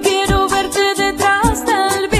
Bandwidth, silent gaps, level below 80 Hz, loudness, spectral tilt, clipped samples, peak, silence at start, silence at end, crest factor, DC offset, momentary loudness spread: 14 kHz; none; -28 dBFS; -15 LUFS; -3.5 dB/octave; under 0.1%; 0 dBFS; 0 s; 0 s; 14 dB; under 0.1%; 2 LU